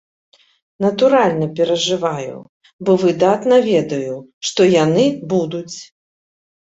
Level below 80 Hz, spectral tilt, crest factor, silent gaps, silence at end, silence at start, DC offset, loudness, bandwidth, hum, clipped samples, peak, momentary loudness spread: -60 dBFS; -5.5 dB/octave; 16 dB; 2.49-2.61 s, 2.73-2.79 s, 4.33-4.41 s; 0.8 s; 0.8 s; under 0.1%; -16 LUFS; 8 kHz; none; under 0.1%; -2 dBFS; 14 LU